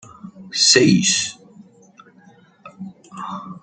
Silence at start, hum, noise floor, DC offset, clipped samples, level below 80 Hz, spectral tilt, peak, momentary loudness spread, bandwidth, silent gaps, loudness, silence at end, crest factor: 0.25 s; none; -50 dBFS; under 0.1%; under 0.1%; -60 dBFS; -2.5 dB/octave; 0 dBFS; 25 LU; 9.4 kHz; none; -15 LUFS; 0.05 s; 22 dB